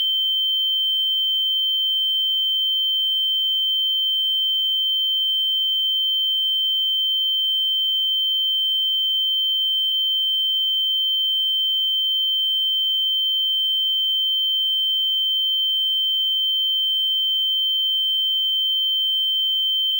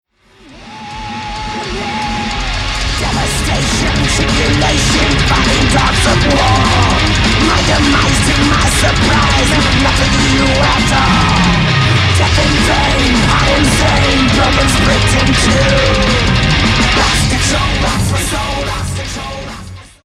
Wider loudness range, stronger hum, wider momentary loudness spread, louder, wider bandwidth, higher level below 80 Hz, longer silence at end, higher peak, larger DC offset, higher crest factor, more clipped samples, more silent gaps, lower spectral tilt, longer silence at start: second, 0 LU vs 4 LU; neither; second, 0 LU vs 9 LU; second, -17 LUFS vs -11 LUFS; about the same, 16 kHz vs 15 kHz; second, under -90 dBFS vs -20 dBFS; second, 0 s vs 0.2 s; second, -14 dBFS vs 0 dBFS; neither; second, 6 dB vs 12 dB; neither; neither; second, 10 dB/octave vs -4 dB/octave; second, 0 s vs 0.5 s